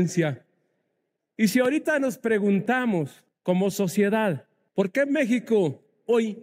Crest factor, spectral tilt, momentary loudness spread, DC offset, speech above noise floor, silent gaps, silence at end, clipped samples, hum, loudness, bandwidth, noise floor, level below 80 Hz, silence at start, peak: 14 dB; -6 dB/octave; 9 LU; under 0.1%; 55 dB; none; 0 s; under 0.1%; none; -24 LUFS; 16 kHz; -78 dBFS; -74 dBFS; 0 s; -10 dBFS